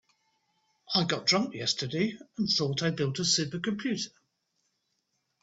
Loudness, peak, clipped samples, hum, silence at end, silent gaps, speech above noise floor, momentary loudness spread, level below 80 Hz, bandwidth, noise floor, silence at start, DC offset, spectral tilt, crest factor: -28 LUFS; -12 dBFS; under 0.1%; none; 1.35 s; none; 49 dB; 7 LU; -68 dBFS; 8 kHz; -78 dBFS; 0.9 s; under 0.1%; -3.5 dB/octave; 20 dB